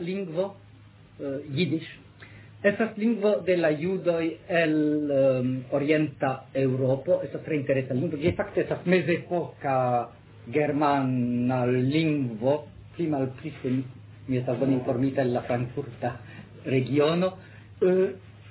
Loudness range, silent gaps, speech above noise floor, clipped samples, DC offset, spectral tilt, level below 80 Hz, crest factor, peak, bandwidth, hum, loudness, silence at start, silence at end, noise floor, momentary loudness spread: 3 LU; none; 26 dB; under 0.1%; under 0.1%; -11 dB/octave; -58 dBFS; 18 dB; -10 dBFS; 4 kHz; none; -26 LUFS; 0 s; 0 s; -51 dBFS; 10 LU